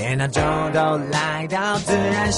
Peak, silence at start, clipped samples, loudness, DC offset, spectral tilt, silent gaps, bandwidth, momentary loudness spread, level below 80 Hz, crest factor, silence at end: -6 dBFS; 0 s; under 0.1%; -21 LUFS; under 0.1%; -4.5 dB/octave; none; 11.5 kHz; 2 LU; -40 dBFS; 14 dB; 0 s